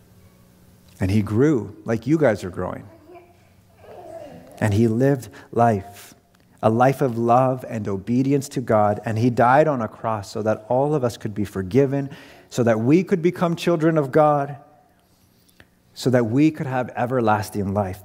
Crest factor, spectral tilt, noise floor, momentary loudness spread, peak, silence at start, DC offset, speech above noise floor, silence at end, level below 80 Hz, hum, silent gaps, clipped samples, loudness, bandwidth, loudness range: 18 dB; -7.5 dB/octave; -58 dBFS; 11 LU; -2 dBFS; 1 s; under 0.1%; 38 dB; 0.05 s; -58 dBFS; none; none; under 0.1%; -21 LUFS; 16 kHz; 4 LU